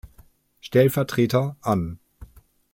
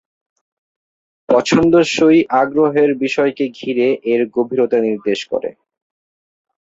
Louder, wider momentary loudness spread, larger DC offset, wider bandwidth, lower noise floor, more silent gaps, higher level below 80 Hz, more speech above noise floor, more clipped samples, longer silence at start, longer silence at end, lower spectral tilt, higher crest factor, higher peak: second, -22 LUFS vs -15 LUFS; first, 18 LU vs 8 LU; neither; first, 16.5 kHz vs 8 kHz; second, -55 dBFS vs under -90 dBFS; neither; about the same, -50 dBFS vs -52 dBFS; second, 34 dB vs over 75 dB; neither; second, 0.05 s vs 1.3 s; second, 0.5 s vs 1.15 s; first, -7 dB/octave vs -5.5 dB/octave; about the same, 18 dB vs 14 dB; second, -6 dBFS vs -2 dBFS